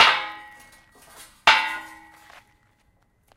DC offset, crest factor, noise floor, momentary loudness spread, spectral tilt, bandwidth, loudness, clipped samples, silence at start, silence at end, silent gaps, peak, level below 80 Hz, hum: under 0.1%; 24 dB; -64 dBFS; 24 LU; 0 dB/octave; 16 kHz; -20 LUFS; under 0.1%; 0 s; 1.5 s; none; -2 dBFS; -60 dBFS; none